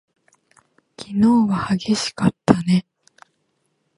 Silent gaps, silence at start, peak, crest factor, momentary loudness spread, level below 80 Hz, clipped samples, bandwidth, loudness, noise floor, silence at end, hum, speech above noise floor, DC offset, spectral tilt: none; 1 s; 0 dBFS; 22 dB; 6 LU; -52 dBFS; under 0.1%; 11.5 kHz; -19 LUFS; -69 dBFS; 1.15 s; none; 52 dB; under 0.1%; -6 dB/octave